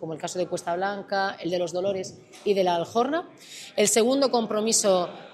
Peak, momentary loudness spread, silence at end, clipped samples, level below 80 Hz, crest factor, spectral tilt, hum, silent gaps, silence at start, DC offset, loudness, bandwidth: -10 dBFS; 12 LU; 0 s; under 0.1%; -72 dBFS; 16 dB; -3 dB/octave; none; none; 0 s; under 0.1%; -25 LUFS; 15.5 kHz